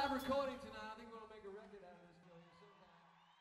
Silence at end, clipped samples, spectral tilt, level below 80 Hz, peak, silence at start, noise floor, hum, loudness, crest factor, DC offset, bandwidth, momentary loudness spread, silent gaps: 0.1 s; under 0.1%; -4.5 dB/octave; -70 dBFS; -28 dBFS; 0 s; -68 dBFS; none; -46 LUFS; 20 dB; under 0.1%; 15.5 kHz; 26 LU; none